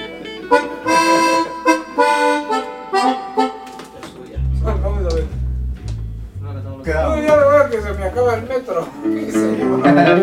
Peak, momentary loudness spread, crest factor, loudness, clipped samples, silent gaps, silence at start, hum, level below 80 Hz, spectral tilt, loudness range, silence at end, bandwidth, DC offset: 0 dBFS; 16 LU; 16 dB; -17 LUFS; under 0.1%; none; 0 s; none; -28 dBFS; -5.5 dB/octave; 7 LU; 0 s; 15.5 kHz; under 0.1%